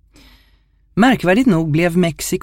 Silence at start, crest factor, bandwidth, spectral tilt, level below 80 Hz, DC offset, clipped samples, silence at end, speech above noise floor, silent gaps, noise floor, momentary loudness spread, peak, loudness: 0.95 s; 16 dB; 16.5 kHz; -5.5 dB/octave; -44 dBFS; under 0.1%; under 0.1%; 0.05 s; 40 dB; none; -54 dBFS; 5 LU; 0 dBFS; -15 LUFS